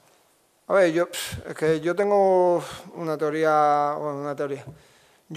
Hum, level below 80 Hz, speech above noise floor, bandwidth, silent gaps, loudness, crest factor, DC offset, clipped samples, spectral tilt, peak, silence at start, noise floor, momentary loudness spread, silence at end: none; -62 dBFS; 40 dB; 15 kHz; none; -23 LUFS; 16 dB; under 0.1%; under 0.1%; -5.5 dB/octave; -8 dBFS; 0.7 s; -63 dBFS; 12 LU; 0 s